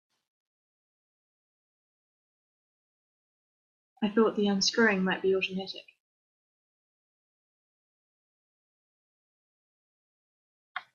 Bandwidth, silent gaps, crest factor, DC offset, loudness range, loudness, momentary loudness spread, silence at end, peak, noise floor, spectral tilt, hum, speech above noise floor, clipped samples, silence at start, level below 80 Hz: 7.2 kHz; 6.00-10.75 s; 22 dB; under 0.1%; 10 LU; -27 LUFS; 18 LU; 0.15 s; -12 dBFS; under -90 dBFS; -4 dB/octave; none; over 63 dB; under 0.1%; 4 s; -76 dBFS